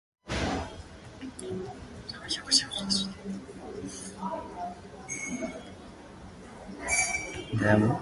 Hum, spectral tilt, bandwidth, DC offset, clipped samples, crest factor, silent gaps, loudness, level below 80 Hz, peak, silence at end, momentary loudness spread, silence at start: none; -3.5 dB/octave; 11.5 kHz; under 0.1%; under 0.1%; 24 dB; none; -31 LUFS; -50 dBFS; -8 dBFS; 0 s; 22 LU; 0.25 s